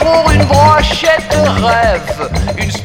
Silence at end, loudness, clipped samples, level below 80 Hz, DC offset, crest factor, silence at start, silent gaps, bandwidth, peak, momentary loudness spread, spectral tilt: 0 s; -10 LUFS; 0.2%; -22 dBFS; under 0.1%; 10 dB; 0 s; none; 16.5 kHz; 0 dBFS; 9 LU; -5 dB/octave